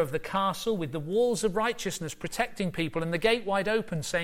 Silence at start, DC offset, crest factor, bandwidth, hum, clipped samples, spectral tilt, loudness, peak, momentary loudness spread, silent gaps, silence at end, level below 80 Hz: 0 s; under 0.1%; 16 dB; 16.5 kHz; none; under 0.1%; -4.5 dB/octave; -29 LUFS; -12 dBFS; 6 LU; none; 0 s; -52 dBFS